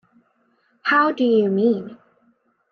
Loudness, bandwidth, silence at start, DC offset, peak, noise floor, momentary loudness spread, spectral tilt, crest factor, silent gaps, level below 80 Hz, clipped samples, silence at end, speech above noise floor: -19 LUFS; 6.4 kHz; 0.85 s; under 0.1%; -6 dBFS; -64 dBFS; 10 LU; -7.5 dB/octave; 16 dB; none; -74 dBFS; under 0.1%; 0.75 s; 46 dB